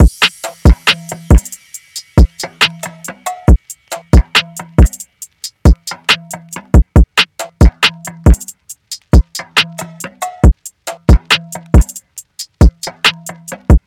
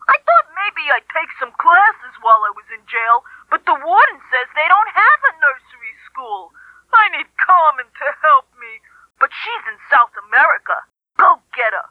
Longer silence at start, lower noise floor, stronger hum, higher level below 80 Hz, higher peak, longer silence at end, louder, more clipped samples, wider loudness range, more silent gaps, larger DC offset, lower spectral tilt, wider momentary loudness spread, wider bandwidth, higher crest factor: about the same, 0 s vs 0.1 s; second, -33 dBFS vs -41 dBFS; neither; first, -14 dBFS vs -70 dBFS; about the same, 0 dBFS vs 0 dBFS; about the same, 0.1 s vs 0.1 s; about the same, -13 LUFS vs -14 LUFS; neither; about the same, 2 LU vs 2 LU; neither; neither; first, -4.5 dB/octave vs -2 dB/octave; about the same, 17 LU vs 16 LU; first, 16 kHz vs 5.2 kHz; about the same, 12 dB vs 16 dB